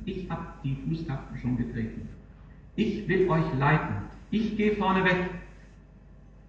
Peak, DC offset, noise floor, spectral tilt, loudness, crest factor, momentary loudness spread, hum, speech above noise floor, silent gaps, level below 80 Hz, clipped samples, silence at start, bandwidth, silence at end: -12 dBFS; under 0.1%; -51 dBFS; -8 dB/octave; -28 LUFS; 18 dB; 12 LU; none; 23 dB; none; -46 dBFS; under 0.1%; 0 s; 7.4 kHz; 0.05 s